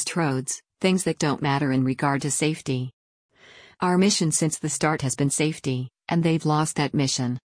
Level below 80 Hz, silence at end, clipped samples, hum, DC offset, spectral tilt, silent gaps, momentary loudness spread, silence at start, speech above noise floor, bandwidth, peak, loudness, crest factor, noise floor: -60 dBFS; 0.1 s; under 0.1%; none; under 0.1%; -4.5 dB/octave; 2.93-3.29 s; 8 LU; 0 s; 28 dB; 10.5 kHz; -8 dBFS; -24 LUFS; 16 dB; -51 dBFS